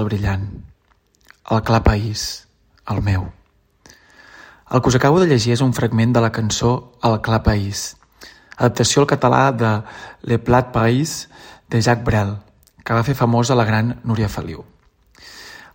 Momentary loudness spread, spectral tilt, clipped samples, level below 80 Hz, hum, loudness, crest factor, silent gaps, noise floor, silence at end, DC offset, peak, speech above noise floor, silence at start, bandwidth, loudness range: 18 LU; -5.5 dB/octave; under 0.1%; -36 dBFS; none; -18 LUFS; 18 dB; none; -59 dBFS; 0.15 s; under 0.1%; 0 dBFS; 42 dB; 0 s; 16.5 kHz; 5 LU